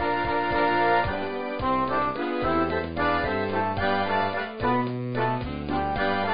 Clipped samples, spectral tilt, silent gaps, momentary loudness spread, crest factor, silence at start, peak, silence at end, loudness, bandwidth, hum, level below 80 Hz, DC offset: under 0.1%; -10.5 dB/octave; none; 6 LU; 14 dB; 0 s; -10 dBFS; 0 s; -26 LUFS; 5.2 kHz; none; -44 dBFS; 0.7%